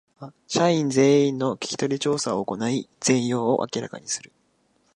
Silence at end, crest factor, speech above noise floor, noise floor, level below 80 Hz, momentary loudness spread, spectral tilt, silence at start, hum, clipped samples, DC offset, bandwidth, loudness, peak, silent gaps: 0.7 s; 18 dB; 43 dB; -66 dBFS; -68 dBFS; 12 LU; -4.5 dB/octave; 0.2 s; none; under 0.1%; under 0.1%; 11.5 kHz; -23 LUFS; -6 dBFS; none